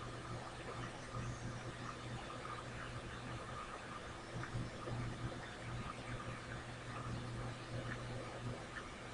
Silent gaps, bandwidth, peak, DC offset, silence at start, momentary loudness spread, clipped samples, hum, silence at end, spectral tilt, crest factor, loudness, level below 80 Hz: none; 10.5 kHz; -32 dBFS; under 0.1%; 0 s; 3 LU; under 0.1%; none; 0 s; -5 dB/octave; 16 dB; -47 LUFS; -58 dBFS